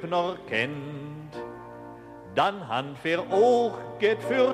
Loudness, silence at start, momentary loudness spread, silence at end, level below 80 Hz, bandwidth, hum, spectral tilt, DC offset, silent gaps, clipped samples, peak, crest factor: -26 LUFS; 0 s; 20 LU; 0 s; -64 dBFS; 12 kHz; none; -5.5 dB/octave; under 0.1%; none; under 0.1%; -10 dBFS; 16 dB